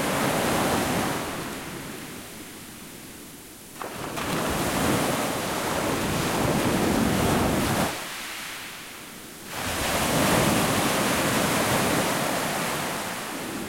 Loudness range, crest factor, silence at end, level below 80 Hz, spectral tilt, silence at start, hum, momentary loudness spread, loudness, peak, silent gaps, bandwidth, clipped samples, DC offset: 8 LU; 18 dB; 0 s; -46 dBFS; -4 dB/octave; 0 s; none; 16 LU; -25 LUFS; -10 dBFS; none; 16.5 kHz; under 0.1%; under 0.1%